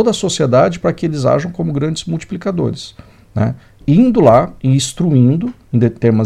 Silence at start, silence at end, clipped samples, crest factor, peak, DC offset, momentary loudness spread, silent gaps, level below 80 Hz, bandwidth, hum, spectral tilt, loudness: 0 s; 0 s; under 0.1%; 14 dB; 0 dBFS; under 0.1%; 11 LU; none; -42 dBFS; 12 kHz; none; -6.5 dB/octave; -14 LUFS